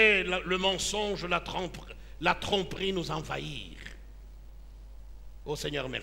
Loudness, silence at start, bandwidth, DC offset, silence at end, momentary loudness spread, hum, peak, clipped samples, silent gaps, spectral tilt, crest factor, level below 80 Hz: -30 LUFS; 0 s; 16 kHz; under 0.1%; 0 s; 24 LU; none; -8 dBFS; under 0.1%; none; -3.5 dB/octave; 24 dB; -46 dBFS